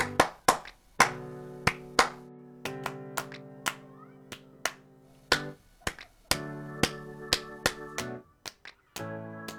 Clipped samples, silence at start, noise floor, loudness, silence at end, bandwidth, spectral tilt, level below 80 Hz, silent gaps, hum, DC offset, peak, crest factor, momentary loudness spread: under 0.1%; 0 s; -57 dBFS; -31 LUFS; 0 s; over 20 kHz; -2.5 dB/octave; -54 dBFS; none; none; under 0.1%; -4 dBFS; 28 dB; 21 LU